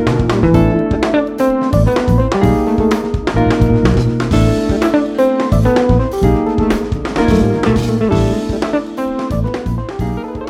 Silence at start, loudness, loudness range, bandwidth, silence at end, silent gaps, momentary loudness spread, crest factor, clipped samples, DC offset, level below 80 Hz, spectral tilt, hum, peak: 0 s; -14 LUFS; 2 LU; 15 kHz; 0 s; none; 7 LU; 12 dB; under 0.1%; under 0.1%; -22 dBFS; -7.5 dB/octave; none; 0 dBFS